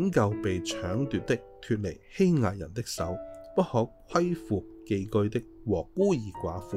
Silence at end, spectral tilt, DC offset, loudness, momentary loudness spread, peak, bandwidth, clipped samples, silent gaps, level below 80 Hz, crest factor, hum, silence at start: 0 s; -6.5 dB/octave; under 0.1%; -30 LUFS; 9 LU; -10 dBFS; 15.5 kHz; under 0.1%; none; -54 dBFS; 18 dB; none; 0 s